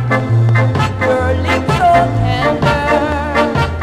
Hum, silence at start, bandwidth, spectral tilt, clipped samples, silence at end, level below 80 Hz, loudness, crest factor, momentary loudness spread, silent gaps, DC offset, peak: none; 0 s; 12 kHz; -7 dB/octave; under 0.1%; 0 s; -28 dBFS; -13 LUFS; 12 dB; 4 LU; none; under 0.1%; 0 dBFS